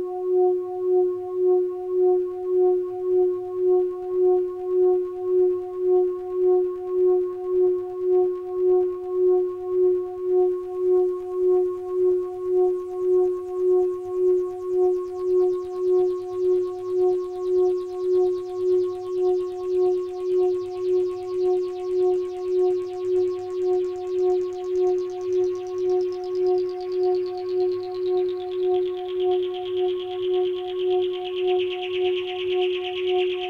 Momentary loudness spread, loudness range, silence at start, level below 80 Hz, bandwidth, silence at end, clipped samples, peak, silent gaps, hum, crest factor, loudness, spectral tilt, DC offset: 5 LU; 3 LU; 0 s; -60 dBFS; 5.6 kHz; 0 s; under 0.1%; -12 dBFS; none; none; 10 dB; -23 LUFS; -6 dB/octave; under 0.1%